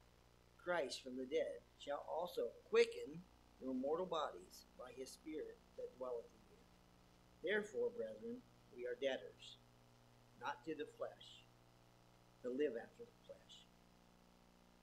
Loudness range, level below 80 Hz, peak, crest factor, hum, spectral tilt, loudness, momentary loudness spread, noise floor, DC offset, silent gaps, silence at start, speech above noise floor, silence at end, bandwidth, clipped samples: 8 LU; -76 dBFS; -22 dBFS; 26 dB; 60 Hz at -75 dBFS; -4 dB/octave; -46 LUFS; 18 LU; -70 dBFS; under 0.1%; none; 0.6 s; 25 dB; 1.2 s; 13.5 kHz; under 0.1%